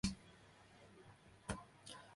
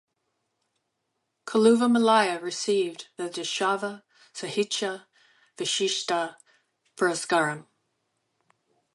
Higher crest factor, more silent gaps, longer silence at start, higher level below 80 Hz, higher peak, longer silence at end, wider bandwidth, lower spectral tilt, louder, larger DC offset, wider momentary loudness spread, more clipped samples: first, 26 dB vs 20 dB; neither; second, 0.05 s vs 1.45 s; first, -62 dBFS vs -80 dBFS; second, -24 dBFS vs -8 dBFS; second, 0 s vs 1.35 s; about the same, 11.5 kHz vs 11.5 kHz; about the same, -4 dB/octave vs -3 dB/octave; second, -52 LUFS vs -25 LUFS; neither; about the same, 15 LU vs 16 LU; neither